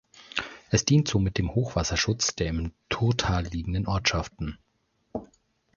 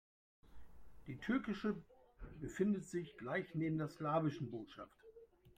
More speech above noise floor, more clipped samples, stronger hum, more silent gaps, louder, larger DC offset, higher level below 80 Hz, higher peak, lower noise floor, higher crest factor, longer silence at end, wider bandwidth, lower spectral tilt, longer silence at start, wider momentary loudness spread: first, 46 dB vs 22 dB; neither; neither; neither; first, -27 LUFS vs -42 LUFS; neither; first, -40 dBFS vs -66 dBFS; first, -6 dBFS vs -24 dBFS; first, -72 dBFS vs -63 dBFS; about the same, 20 dB vs 20 dB; first, 0.5 s vs 0.05 s; second, 7.4 kHz vs 15.5 kHz; second, -4.5 dB/octave vs -7 dB/octave; second, 0.15 s vs 0.45 s; second, 14 LU vs 20 LU